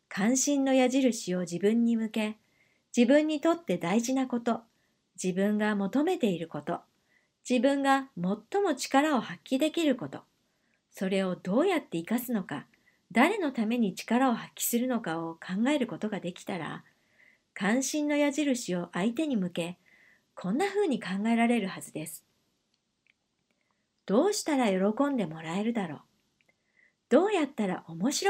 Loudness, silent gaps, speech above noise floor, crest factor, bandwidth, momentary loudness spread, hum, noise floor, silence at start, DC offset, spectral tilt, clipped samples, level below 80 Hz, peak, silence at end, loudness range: -29 LUFS; none; 49 dB; 20 dB; 16 kHz; 11 LU; none; -77 dBFS; 0.1 s; under 0.1%; -4.5 dB/octave; under 0.1%; -80 dBFS; -10 dBFS; 0 s; 4 LU